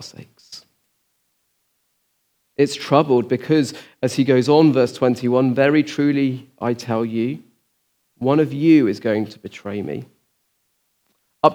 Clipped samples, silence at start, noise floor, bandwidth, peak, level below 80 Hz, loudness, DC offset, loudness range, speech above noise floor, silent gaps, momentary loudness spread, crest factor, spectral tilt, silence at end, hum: under 0.1%; 0 s; -69 dBFS; 14.5 kHz; 0 dBFS; -72 dBFS; -19 LUFS; under 0.1%; 5 LU; 50 dB; none; 18 LU; 20 dB; -6.5 dB/octave; 0 s; none